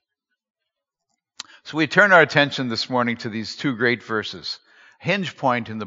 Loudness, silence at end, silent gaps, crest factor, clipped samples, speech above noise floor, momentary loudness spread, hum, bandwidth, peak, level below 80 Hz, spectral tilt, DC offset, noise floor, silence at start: -20 LUFS; 0 s; none; 22 dB; under 0.1%; 62 dB; 18 LU; none; 7.6 kHz; 0 dBFS; -70 dBFS; -2.5 dB/octave; under 0.1%; -82 dBFS; 1.4 s